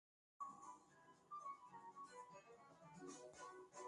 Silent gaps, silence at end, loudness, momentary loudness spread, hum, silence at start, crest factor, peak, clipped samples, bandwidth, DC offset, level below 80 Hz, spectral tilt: none; 0 s; -59 LUFS; 10 LU; none; 0.4 s; 16 dB; -42 dBFS; under 0.1%; 11 kHz; under 0.1%; under -90 dBFS; -3.5 dB/octave